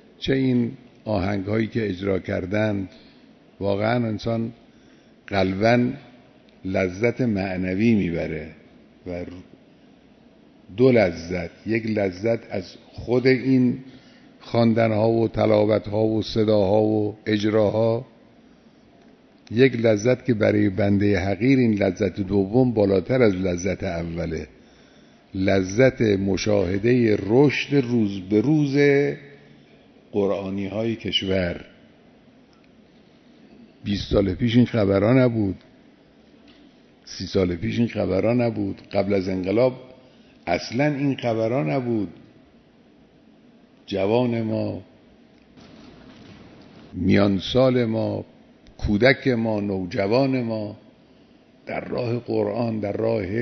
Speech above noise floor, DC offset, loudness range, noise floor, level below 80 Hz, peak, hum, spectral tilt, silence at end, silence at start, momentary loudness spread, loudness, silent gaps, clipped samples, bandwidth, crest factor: 33 dB; under 0.1%; 7 LU; -54 dBFS; -48 dBFS; -2 dBFS; none; -7 dB/octave; 0 s; 0.2 s; 12 LU; -22 LUFS; none; under 0.1%; 6.4 kHz; 22 dB